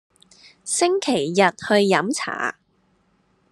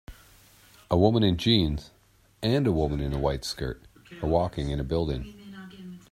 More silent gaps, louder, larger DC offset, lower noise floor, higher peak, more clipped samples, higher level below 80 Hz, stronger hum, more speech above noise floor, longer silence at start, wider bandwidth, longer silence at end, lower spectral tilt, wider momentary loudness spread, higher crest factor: neither; first, -20 LUFS vs -26 LUFS; neither; first, -64 dBFS vs -56 dBFS; first, -2 dBFS vs -6 dBFS; neither; second, -70 dBFS vs -40 dBFS; neither; first, 44 dB vs 30 dB; first, 0.65 s vs 0.1 s; second, 12.5 kHz vs 16 kHz; first, 1 s vs 0.15 s; second, -3.5 dB/octave vs -6.5 dB/octave; second, 9 LU vs 21 LU; about the same, 22 dB vs 22 dB